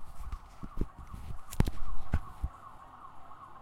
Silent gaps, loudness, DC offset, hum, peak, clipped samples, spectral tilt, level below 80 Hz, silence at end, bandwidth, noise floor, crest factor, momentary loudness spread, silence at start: none; -40 LUFS; under 0.1%; none; -8 dBFS; under 0.1%; -6.5 dB/octave; -40 dBFS; 0 s; 15.5 kHz; -50 dBFS; 22 dB; 17 LU; 0 s